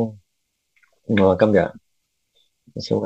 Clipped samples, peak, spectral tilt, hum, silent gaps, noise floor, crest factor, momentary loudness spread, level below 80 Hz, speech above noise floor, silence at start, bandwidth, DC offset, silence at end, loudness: under 0.1%; 0 dBFS; -7.5 dB/octave; none; none; -74 dBFS; 22 dB; 21 LU; -56 dBFS; 56 dB; 0 s; 8.2 kHz; under 0.1%; 0 s; -19 LUFS